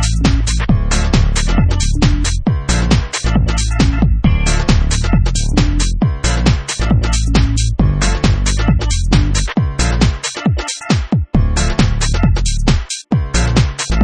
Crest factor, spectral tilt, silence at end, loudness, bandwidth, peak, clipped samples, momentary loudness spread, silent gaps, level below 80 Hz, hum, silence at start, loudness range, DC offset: 12 dB; -5 dB/octave; 0 s; -15 LUFS; 10 kHz; 0 dBFS; under 0.1%; 3 LU; none; -16 dBFS; none; 0 s; 1 LU; under 0.1%